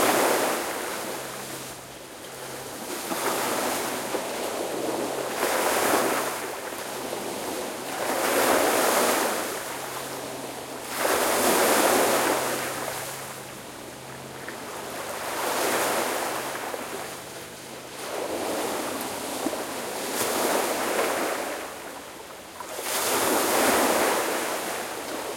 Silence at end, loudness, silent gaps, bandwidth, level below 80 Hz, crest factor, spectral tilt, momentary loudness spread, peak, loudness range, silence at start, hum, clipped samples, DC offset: 0 s; -26 LUFS; none; 16.5 kHz; -64 dBFS; 20 dB; -2 dB/octave; 16 LU; -8 dBFS; 7 LU; 0 s; none; under 0.1%; under 0.1%